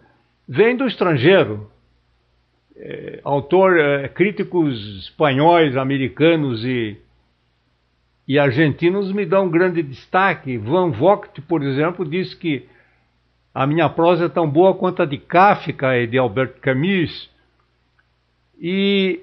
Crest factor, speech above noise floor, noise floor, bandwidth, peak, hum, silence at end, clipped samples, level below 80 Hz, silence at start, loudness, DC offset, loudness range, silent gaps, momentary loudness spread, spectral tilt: 18 dB; 46 dB; -64 dBFS; 5.8 kHz; 0 dBFS; 60 Hz at -50 dBFS; 0 s; under 0.1%; -56 dBFS; 0.5 s; -18 LUFS; under 0.1%; 4 LU; none; 11 LU; -9.5 dB/octave